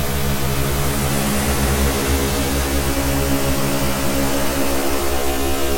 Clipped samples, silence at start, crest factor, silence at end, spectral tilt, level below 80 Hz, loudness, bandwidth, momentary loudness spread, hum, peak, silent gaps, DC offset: under 0.1%; 0 s; 12 dB; 0 s; -4 dB/octave; -26 dBFS; -19 LUFS; 17 kHz; 2 LU; none; -4 dBFS; none; under 0.1%